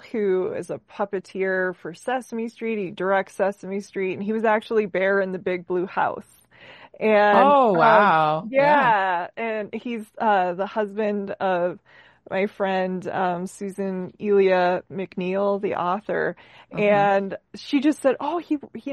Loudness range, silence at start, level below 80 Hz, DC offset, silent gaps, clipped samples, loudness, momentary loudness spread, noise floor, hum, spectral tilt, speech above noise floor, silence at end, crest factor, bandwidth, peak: 8 LU; 0.05 s; -68 dBFS; under 0.1%; none; under 0.1%; -22 LUFS; 13 LU; -47 dBFS; none; -6.5 dB/octave; 25 dB; 0 s; 20 dB; 12.5 kHz; -2 dBFS